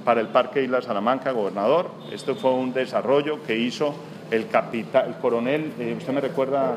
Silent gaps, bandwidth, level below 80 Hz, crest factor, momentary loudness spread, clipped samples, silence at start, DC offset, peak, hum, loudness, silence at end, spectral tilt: none; 14.5 kHz; -76 dBFS; 20 dB; 6 LU; under 0.1%; 0 s; under 0.1%; -4 dBFS; none; -24 LUFS; 0 s; -6 dB/octave